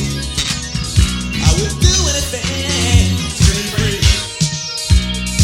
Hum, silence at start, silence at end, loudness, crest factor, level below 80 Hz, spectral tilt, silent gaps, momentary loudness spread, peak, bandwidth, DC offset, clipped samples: none; 0 s; 0 s; -15 LUFS; 14 dB; -20 dBFS; -3.5 dB/octave; none; 6 LU; 0 dBFS; 16.5 kHz; under 0.1%; under 0.1%